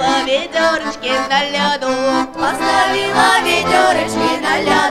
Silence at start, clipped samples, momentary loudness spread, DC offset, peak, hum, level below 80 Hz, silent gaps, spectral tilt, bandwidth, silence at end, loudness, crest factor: 0 s; under 0.1%; 5 LU; 0.2%; 0 dBFS; none; -48 dBFS; none; -3 dB/octave; 16 kHz; 0 s; -14 LUFS; 14 dB